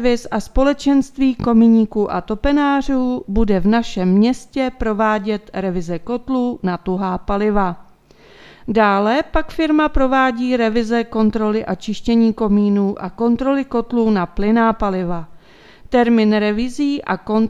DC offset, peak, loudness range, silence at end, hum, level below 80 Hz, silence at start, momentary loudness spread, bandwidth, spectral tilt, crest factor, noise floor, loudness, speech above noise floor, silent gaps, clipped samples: under 0.1%; -2 dBFS; 4 LU; 0 s; none; -34 dBFS; 0 s; 8 LU; 9.6 kHz; -7 dB/octave; 16 dB; -47 dBFS; -17 LUFS; 30 dB; none; under 0.1%